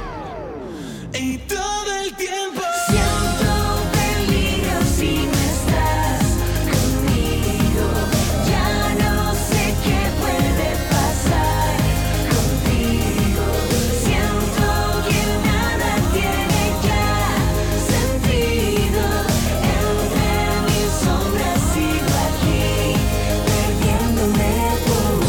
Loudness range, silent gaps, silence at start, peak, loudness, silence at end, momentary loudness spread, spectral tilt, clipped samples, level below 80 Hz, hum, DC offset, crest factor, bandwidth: 1 LU; none; 0 s; -4 dBFS; -19 LUFS; 0 s; 3 LU; -5 dB/octave; under 0.1%; -24 dBFS; none; under 0.1%; 14 dB; 19 kHz